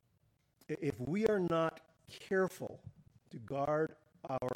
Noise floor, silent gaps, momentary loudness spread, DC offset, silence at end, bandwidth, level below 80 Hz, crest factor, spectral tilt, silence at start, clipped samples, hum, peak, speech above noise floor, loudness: -75 dBFS; none; 20 LU; under 0.1%; 0 s; 17 kHz; -70 dBFS; 20 dB; -7 dB/octave; 0.7 s; under 0.1%; none; -18 dBFS; 39 dB; -36 LUFS